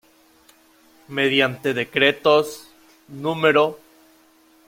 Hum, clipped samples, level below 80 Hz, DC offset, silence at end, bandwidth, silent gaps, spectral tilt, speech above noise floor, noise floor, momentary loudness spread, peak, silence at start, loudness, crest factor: none; under 0.1%; -64 dBFS; under 0.1%; 0.9 s; 16.5 kHz; none; -4.5 dB/octave; 36 dB; -55 dBFS; 13 LU; -2 dBFS; 1.1 s; -20 LUFS; 20 dB